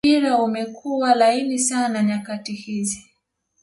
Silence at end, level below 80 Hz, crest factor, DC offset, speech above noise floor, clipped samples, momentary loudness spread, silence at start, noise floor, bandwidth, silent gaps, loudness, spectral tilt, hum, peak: 0.65 s; -62 dBFS; 16 dB; under 0.1%; 50 dB; under 0.1%; 12 LU; 0.05 s; -70 dBFS; 11.5 kHz; none; -21 LUFS; -3.5 dB/octave; none; -4 dBFS